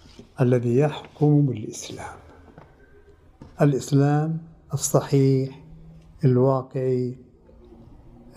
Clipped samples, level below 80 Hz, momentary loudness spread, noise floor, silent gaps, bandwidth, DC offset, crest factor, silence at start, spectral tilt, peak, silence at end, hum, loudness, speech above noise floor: under 0.1%; -54 dBFS; 14 LU; -52 dBFS; none; 13 kHz; under 0.1%; 18 dB; 0.4 s; -7 dB/octave; -6 dBFS; 1.15 s; none; -23 LUFS; 30 dB